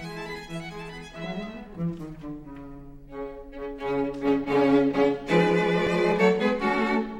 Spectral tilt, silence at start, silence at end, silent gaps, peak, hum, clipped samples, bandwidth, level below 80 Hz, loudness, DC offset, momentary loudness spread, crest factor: -7 dB/octave; 0 s; 0 s; none; -8 dBFS; none; under 0.1%; 11.5 kHz; -48 dBFS; -25 LUFS; under 0.1%; 18 LU; 18 dB